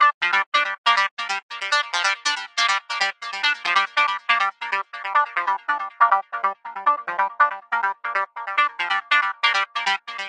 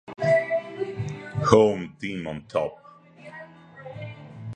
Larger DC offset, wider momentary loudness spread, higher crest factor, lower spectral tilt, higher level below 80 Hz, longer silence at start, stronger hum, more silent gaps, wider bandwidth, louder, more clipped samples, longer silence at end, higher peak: neither; second, 7 LU vs 24 LU; second, 20 dB vs 26 dB; second, 1.5 dB/octave vs -6.5 dB/octave; second, under -90 dBFS vs -54 dBFS; about the same, 0 s vs 0.1 s; neither; first, 0.14-0.21 s, 0.46-0.52 s, 0.78-0.84 s, 1.11-1.17 s, 1.43-1.49 s vs none; first, 11 kHz vs 9.4 kHz; first, -21 LUFS vs -25 LUFS; neither; about the same, 0 s vs 0 s; about the same, -2 dBFS vs 0 dBFS